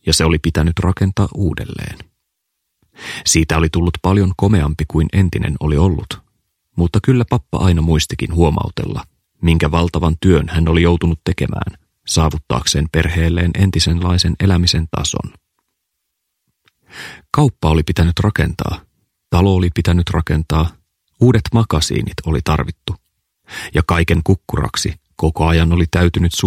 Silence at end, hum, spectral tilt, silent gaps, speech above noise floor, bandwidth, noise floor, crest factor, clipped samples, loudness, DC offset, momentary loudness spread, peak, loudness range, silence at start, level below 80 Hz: 0 s; none; -5.5 dB/octave; none; 59 dB; 15 kHz; -74 dBFS; 16 dB; under 0.1%; -16 LUFS; under 0.1%; 11 LU; 0 dBFS; 3 LU; 0.05 s; -26 dBFS